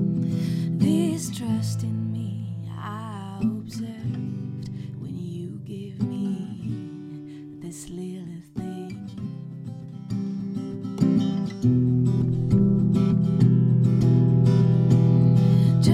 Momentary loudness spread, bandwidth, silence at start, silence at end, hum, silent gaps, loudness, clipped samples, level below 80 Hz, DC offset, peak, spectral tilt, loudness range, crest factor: 17 LU; 12 kHz; 0 s; 0 s; none; none; -23 LUFS; under 0.1%; -52 dBFS; under 0.1%; -8 dBFS; -8.5 dB/octave; 14 LU; 16 dB